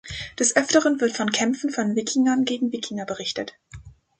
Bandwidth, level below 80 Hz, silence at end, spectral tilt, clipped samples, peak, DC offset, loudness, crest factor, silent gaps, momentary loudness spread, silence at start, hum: 9.6 kHz; -54 dBFS; 0.3 s; -3 dB/octave; under 0.1%; -2 dBFS; under 0.1%; -22 LUFS; 20 dB; none; 11 LU; 0.05 s; none